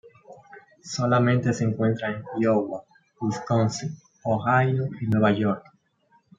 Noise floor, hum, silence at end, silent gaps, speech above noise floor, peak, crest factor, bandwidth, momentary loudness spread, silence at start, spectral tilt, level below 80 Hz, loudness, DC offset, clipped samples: -64 dBFS; none; 0.8 s; none; 41 dB; -8 dBFS; 16 dB; 7.8 kHz; 13 LU; 0.05 s; -6.5 dB/octave; -64 dBFS; -24 LUFS; under 0.1%; under 0.1%